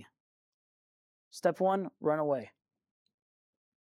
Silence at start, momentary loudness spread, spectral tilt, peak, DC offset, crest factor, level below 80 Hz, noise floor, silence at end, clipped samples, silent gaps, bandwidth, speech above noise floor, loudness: 0 s; 15 LU; -6.5 dB/octave; -14 dBFS; under 0.1%; 22 dB; -88 dBFS; under -90 dBFS; 1.45 s; under 0.1%; 0.20-1.31 s; 13 kHz; over 59 dB; -32 LUFS